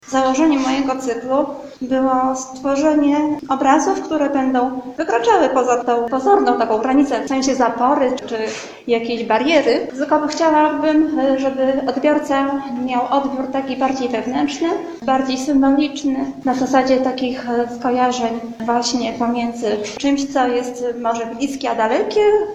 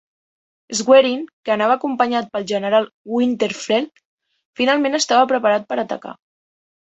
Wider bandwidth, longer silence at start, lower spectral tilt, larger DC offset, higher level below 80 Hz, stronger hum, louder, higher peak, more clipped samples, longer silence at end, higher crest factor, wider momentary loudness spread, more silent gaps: about the same, 8.8 kHz vs 8.2 kHz; second, 0.05 s vs 0.7 s; about the same, -4 dB/octave vs -3 dB/octave; neither; first, -52 dBFS vs -66 dBFS; neither; about the same, -18 LUFS vs -18 LUFS; about the same, 0 dBFS vs 0 dBFS; neither; second, 0 s vs 0.7 s; about the same, 16 dB vs 18 dB; second, 7 LU vs 12 LU; second, none vs 1.33-1.43 s, 2.93-3.05 s, 4.05-4.18 s, 4.45-4.53 s